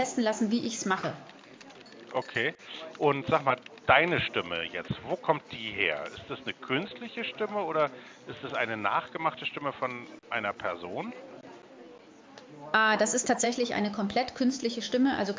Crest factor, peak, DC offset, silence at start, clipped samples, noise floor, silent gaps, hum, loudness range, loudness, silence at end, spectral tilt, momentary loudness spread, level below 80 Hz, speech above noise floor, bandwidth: 24 dB; -6 dBFS; under 0.1%; 0 s; under 0.1%; -52 dBFS; none; none; 5 LU; -29 LUFS; 0 s; -3.5 dB/octave; 20 LU; -64 dBFS; 22 dB; 7.8 kHz